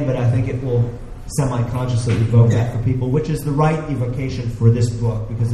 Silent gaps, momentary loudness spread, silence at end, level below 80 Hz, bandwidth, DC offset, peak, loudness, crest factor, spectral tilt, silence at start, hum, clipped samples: none; 8 LU; 0 s; -34 dBFS; 12.5 kHz; under 0.1%; 0 dBFS; -19 LUFS; 16 dB; -7.5 dB/octave; 0 s; none; under 0.1%